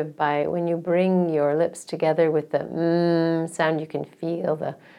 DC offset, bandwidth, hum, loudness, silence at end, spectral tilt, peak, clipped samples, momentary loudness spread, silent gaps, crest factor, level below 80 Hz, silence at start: under 0.1%; 12 kHz; none; -23 LUFS; 0.25 s; -7 dB/octave; -6 dBFS; under 0.1%; 7 LU; none; 16 dB; -70 dBFS; 0 s